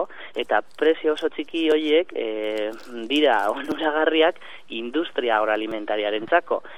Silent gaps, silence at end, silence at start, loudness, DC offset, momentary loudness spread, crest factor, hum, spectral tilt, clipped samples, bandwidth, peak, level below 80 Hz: none; 0 s; 0 s; -23 LUFS; 0.9%; 10 LU; 20 dB; none; -4 dB/octave; under 0.1%; 12.5 kHz; -4 dBFS; -66 dBFS